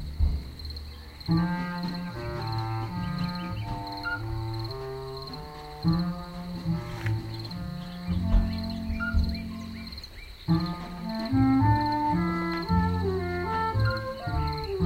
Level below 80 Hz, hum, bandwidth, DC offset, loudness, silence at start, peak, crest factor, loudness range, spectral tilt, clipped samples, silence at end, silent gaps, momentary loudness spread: -36 dBFS; none; 16 kHz; under 0.1%; -30 LUFS; 0 s; -10 dBFS; 18 dB; 6 LU; -7.5 dB/octave; under 0.1%; 0 s; none; 12 LU